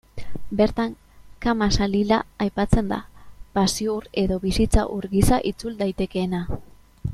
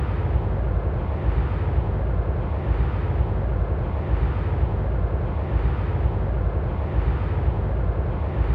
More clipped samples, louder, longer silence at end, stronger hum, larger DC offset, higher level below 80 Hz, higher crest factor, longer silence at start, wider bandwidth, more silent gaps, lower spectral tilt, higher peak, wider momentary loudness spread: neither; about the same, -23 LUFS vs -25 LUFS; about the same, 0 s vs 0 s; neither; neither; second, -32 dBFS vs -24 dBFS; first, 20 dB vs 14 dB; first, 0.15 s vs 0 s; first, 14 kHz vs 4.3 kHz; neither; second, -5.5 dB/octave vs -11 dB/octave; first, -2 dBFS vs -10 dBFS; first, 9 LU vs 2 LU